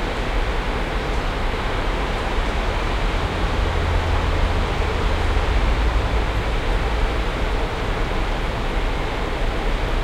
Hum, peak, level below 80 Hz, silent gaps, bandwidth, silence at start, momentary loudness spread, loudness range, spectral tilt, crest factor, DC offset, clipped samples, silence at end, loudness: none; -6 dBFS; -22 dBFS; none; 11.5 kHz; 0 s; 3 LU; 2 LU; -5.5 dB/octave; 14 dB; under 0.1%; under 0.1%; 0 s; -23 LUFS